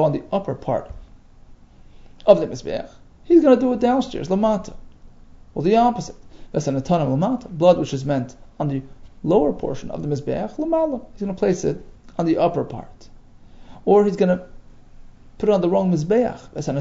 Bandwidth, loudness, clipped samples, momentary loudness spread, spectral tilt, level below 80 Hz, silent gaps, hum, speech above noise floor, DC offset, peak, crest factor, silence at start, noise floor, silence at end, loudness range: 7.8 kHz; -20 LUFS; under 0.1%; 13 LU; -7.5 dB/octave; -44 dBFS; none; none; 26 dB; under 0.1%; 0 dBFS; 20 dB; 0 s; -45 dBFS; 0 s; 4 LU